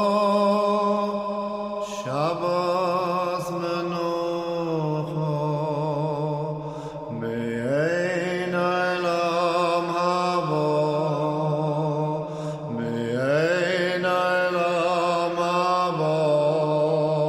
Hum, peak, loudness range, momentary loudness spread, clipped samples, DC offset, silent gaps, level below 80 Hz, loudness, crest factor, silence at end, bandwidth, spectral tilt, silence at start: none; -10 dBFS; 4 LU; 7 LU; under 0.1%; under 0.1%; none; -62 dBFS; -24 LUFS; 14 dB; 0 s; 13.5 kHz; -6.5 dB/octave; 0 s